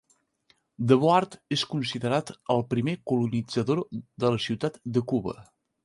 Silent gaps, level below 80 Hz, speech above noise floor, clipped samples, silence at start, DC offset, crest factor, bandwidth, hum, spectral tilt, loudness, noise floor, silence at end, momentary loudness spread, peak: none; -62 dBFS; 41 dB; under 0.1%; 0.8 s; under 0.1%; 20 dB; 11.5 kHz; none; -6.5 dB/octave; -27 LUFS; -67 dBFS; 0.45 s; 8 LU; -6 dBFS